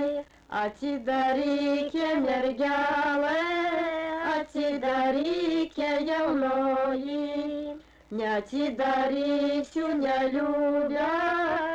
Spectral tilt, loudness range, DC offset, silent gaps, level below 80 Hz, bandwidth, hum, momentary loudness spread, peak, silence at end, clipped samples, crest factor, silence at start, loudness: -5 dB/octave; 2 LU; under 0.1%; none; -60 dBFS; 8.4 kHz; none; 6 LU; -18 dBFS; 0 s; under 0.1%; 8 dB; 0 s; -27 LUFS